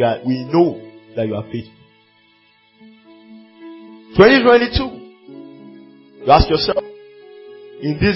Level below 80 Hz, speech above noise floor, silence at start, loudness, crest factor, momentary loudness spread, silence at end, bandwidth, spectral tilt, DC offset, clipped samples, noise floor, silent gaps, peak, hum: -34 dBFS; 41 dB; 0 s; -15 LUFS; 18 dB; 27 LU; 0 s; 5.8 kHz; -9 dB/octave; under 0.1%; under 0.1%; -55 dBFS; none; 0 dBFS; none